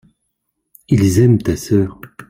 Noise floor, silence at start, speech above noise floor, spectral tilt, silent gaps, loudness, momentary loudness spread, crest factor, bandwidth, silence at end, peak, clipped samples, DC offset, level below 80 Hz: -72 dBFS; 0.9 s; 59 dB; -7.5 dB/octave; none; -15 LUFS; 6 LU; 14 dB; 16 kHz; 0.1 s; -2 dBFS; under 0.1%; under 0.1%; -42 dBFS